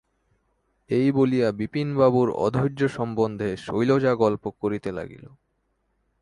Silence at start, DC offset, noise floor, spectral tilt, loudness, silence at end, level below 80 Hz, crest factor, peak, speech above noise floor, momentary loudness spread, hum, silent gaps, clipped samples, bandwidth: 0.9 s; under 0.1%; -72 dBFS; -8 dB/octave; -23 LUFS; 1.05 s; -56 dBFS; 18 dB; -6 dBFS; 49 dB; 9 LU; none; none; under 0.1%; 11 kHz